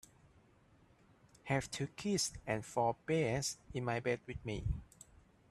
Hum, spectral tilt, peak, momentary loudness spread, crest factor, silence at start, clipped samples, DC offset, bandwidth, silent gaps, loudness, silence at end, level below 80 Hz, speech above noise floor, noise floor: none; -4.5 dB/octave; -22 dBFS; 8 LU; 18 dB; 1.45 s; under 0.1%; under 0.1%; 13.5 kHz; none; -38 LUFS; 0.45 s; -54 dBFS; 30 dB; -67 dBFS